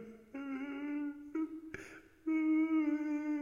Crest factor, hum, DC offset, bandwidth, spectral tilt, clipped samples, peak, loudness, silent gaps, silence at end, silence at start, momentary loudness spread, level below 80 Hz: 12 dB; none; under 0.1%; 7.2 kHz; -6 dB/octave; under 0.1%; -24 dBFS; -37 LUFS; none; 0 s; 0 s; 17 LU; -74 dBFS